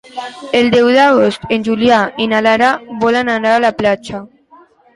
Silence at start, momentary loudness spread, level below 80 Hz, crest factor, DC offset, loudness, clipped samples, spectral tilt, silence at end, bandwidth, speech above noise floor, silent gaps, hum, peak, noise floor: 0.15 s; 11 LU; -50 dBFS; 12 dB; under 0.1%; -12 LUFS; under 0.1%; -5 dB/octave; 0.7 s; 11.5 kHz; 33 dB; none; none; 0 dBFS; -45 dBFS